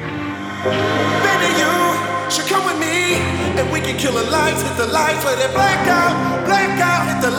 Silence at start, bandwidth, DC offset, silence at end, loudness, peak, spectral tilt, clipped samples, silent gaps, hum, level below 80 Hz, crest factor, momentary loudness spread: 0 s; over 20 kHz; under 0.1%; 0 s; -16 LUFS; -2 dBFS; -4 dB/octave; under 0.1%; none; none; -44 dBFS; 14 dB; 4 LU